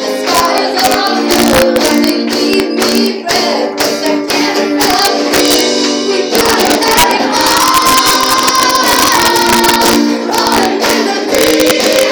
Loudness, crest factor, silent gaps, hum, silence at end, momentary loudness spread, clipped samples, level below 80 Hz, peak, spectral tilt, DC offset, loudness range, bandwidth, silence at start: -9 LUFS; 10 dB; none; none; 0 s; 4 LU; 0.1%; -38 dBFS; 0 dBFS; -2 dB/octave; under 0.1%; 3 LU; over 20 kHz; 0 s